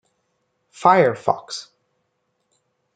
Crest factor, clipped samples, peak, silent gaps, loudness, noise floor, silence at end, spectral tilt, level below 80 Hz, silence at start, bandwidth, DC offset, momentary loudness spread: 22 dB; under 0.1%; -2 dBFS; none; -18 LUFS; -72 dBFS; 1.35 s; -5 dB/octave; -68 dBFS; 0.8 s; 9.2 kHz; under 0.1%; 18 LU